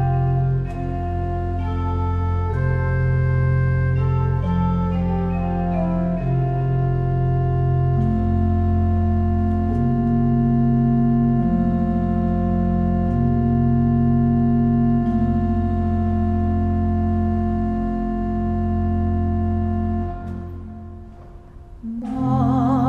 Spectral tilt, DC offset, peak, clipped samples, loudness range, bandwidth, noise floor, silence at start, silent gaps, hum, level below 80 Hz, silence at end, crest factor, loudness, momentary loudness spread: -11 dB/octave; under 0.1%; -8 dBFS; under 0.1%; 4 LU; 4.1 kHz; -40 dBFS; 0 s; none; none; -30 dBFS; 0 s; 12 dB; -20 LUFS; 7 LU